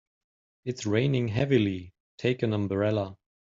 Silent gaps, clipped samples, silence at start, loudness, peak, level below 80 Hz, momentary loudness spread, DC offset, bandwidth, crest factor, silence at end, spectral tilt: 2.00-2.18 s; under 0.1%; 0.65 s; -28 LUFS; -10 dBFS; -60 dBFS; 13 LU; under 0.1%; 7.8 kHz; 18 dB; 0.35 s; -6.5 dB/octave